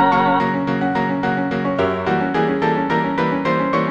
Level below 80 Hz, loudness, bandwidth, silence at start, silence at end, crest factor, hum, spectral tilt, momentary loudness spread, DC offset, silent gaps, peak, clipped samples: -50 dBFS; -19 LUFS; 7.6 kHz; 0 s; 0 s; 16 dB; none; -7.5 dB/octave; 3 LU; under 0.1%; none; -2 dBFS; under 0.1%